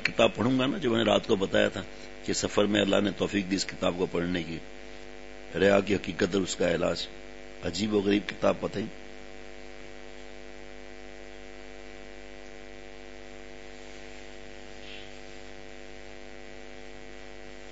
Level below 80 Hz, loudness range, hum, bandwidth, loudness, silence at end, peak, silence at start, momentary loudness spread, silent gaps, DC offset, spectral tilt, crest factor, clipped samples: -54 dBFS; 19 LU; none; 8 kHz; -28 LUFS; 0 s; -6 dBFS; 0 s; 21 LU; none; 0.6%; -4.5 dB/octave; 24 dB; under 0.1%